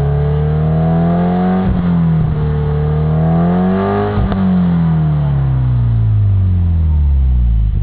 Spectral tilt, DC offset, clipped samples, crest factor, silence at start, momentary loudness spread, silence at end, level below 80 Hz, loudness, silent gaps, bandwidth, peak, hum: -13 dB/octave; 2%; under 0.1%; 10 dB; 0 s; 2 LU; 0 s; -18 dBFS; -14 LUFS; none; 4 kHz; -2 dBFS; none